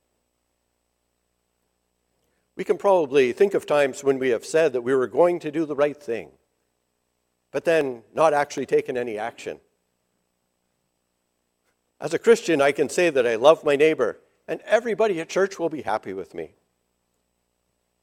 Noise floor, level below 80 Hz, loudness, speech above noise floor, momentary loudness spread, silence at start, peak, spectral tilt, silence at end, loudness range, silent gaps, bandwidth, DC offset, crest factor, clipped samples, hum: -74 dBFS; -70 dBFS; -22 LUFS; 53 dB; 15 LU; 2.55 s; -2 dBFS; -4.5 dB/octave; 1.55 s; 7 LU; none; 15 kHz; under 0.1%; 22 dB; under 0.1%; 60 Hz at -65 dBFS